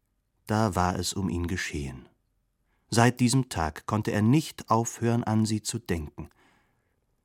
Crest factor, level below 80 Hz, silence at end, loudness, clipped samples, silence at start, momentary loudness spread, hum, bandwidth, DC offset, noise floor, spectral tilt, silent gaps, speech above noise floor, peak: 24 dB; -48 dBFS; 0.95 s; -27 LUFS; under 0.1%; 0.45 s; 12 LU; none; 16.5 kHz; under 0.1%; -73 dBFS; -5.5 dB/octave; none; 47 dB; -4 dBFS